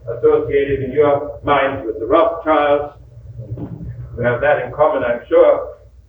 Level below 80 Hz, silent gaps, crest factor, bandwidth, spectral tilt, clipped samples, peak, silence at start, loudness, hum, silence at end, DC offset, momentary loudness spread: -40 dBFS; none; 16 dB; 3.9 kHz; -9 dB/octave; under 0.1%; 0 dBFS; 0.05 s; -16 LUFS; none; 0.35 s; under 0.1%; 17 LU